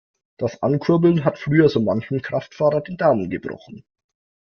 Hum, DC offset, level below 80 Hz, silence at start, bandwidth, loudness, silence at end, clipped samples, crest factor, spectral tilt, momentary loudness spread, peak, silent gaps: none; under 0.1%; -58 dBFS; 0.4 s; 6.6 kHz; -20 LUFS; 0.7 s; under 0.1%; 18 dB; -8.5 dB/octave; 11 LU; -4 dBFS; none